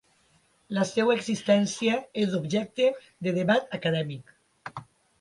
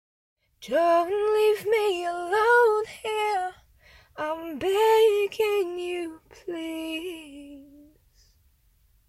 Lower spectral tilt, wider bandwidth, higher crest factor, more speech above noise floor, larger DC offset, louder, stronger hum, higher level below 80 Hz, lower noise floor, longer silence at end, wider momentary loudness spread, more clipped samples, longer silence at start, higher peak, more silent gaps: first, -5.5 dB/octave vs -3 dB/octave; second, 11.5 kHz vs 14.5 kHz; about the same, 18 dB vs 16 dB; about the same, 39 dB vs 39 dB; neither; second, -27 LUFS vs -24 LUFS; neither; second, -70 dBFS vs -62 dBFS; about the same, -65 dBFS vs -63 dBFS; second, 0.4 s vs 1.45 s; about the same, 18 LU vs 18 LU; neither; about the same, 0.7 s vs 0.6 s; about the same, -10 dBFS vs -10 dBFS; neither